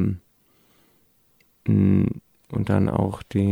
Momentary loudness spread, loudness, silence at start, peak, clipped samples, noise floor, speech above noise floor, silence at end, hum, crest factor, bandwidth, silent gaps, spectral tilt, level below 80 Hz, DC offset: 13 LU; -23 LUFS; 0 s; -8 dBFS; under 0.1%; -62 dBFS; 42 dB; 0 s; none; 16 dB; 10.5 kHz; none; -9.5 dB/octave; -48 dBFS; under 0.1%